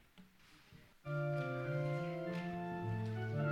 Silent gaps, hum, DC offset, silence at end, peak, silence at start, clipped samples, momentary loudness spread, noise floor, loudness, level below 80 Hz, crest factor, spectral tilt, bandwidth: none; none; under 0.1%; 0 s; -26 dBFS; 0.15 s; under 0.1%; 9 LU; -64 dBFS; -41 LUFS; -68 dBFS; 14 dB; -8.5 dB/octave; 10.5 kHz